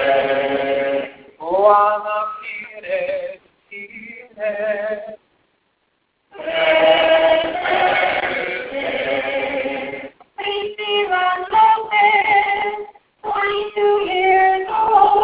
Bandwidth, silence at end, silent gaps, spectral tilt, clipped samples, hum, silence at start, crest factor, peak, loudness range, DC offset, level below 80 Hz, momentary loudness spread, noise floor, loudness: 4 kHz; 0 s; none; -6.5 dB/octave; under 0.1%; none; 0 s; 18 dB; 0 dBFS; 9 LU; under 0.1%; -56 dBFS; 19 LU; -67 dBFS; -17 LUFS